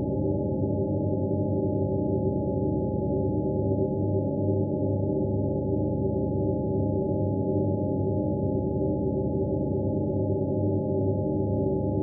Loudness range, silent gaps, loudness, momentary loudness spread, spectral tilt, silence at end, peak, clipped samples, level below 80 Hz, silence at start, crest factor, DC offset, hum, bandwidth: 0 LU; none; -27 LUFS; 1 LU; -7 dB/octave; 0 s; -14 dBFS; under 0.1%; -42 dBFS; 0 s; 12 dB; under 0.1%; none; 0.9 kHz